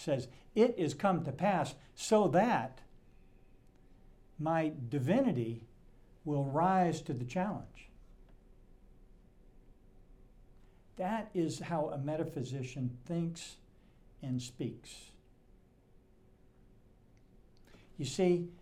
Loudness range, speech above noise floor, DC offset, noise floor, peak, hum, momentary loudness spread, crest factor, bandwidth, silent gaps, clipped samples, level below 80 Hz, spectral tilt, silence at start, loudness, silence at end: 13 LU; 30 dB; under 0.1%; -64 dBFS; -16 dBFS; none; 16 LU; 22 dB; 14.5 kHz; none; under 0.1%; -62 dBFS; -6.5 dB/octave; 0 s; -34 LUFS; 0.05 s